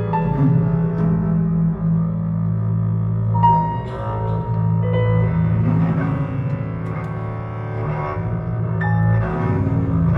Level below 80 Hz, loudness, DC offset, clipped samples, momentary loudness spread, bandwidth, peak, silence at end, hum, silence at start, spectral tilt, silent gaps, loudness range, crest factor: -36 dBFS; -20 LUFS; under 0.1%; under 0.1%; 8 LU; 3.8 kHz; -4 dBFS; 0 s; none; 0 s; -11 dB/octave; none; 4 LU; 16 dB